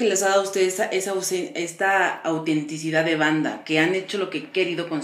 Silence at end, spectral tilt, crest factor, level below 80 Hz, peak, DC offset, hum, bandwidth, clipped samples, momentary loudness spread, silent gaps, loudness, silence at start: 0 s; -3.5 dB/octave; 18 dB; -84 dBFS; -4 dBFS; under 0.1%; none; 15.5 kHz; under 0.1%; 6 LU; none; -23 LUFS; 0 s